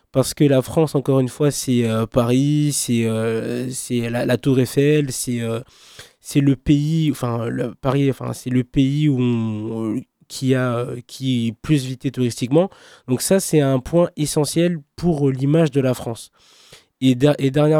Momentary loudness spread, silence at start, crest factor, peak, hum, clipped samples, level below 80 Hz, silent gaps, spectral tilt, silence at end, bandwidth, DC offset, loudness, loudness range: 8 LU; 0.15 s; 16 dB; -2 dBFS; none; under 0.1%; -46 dBFS; none; -6 dB/octave; 0 s; 16.5 kHz; under 0.1%; -19 LUFS; 3 LU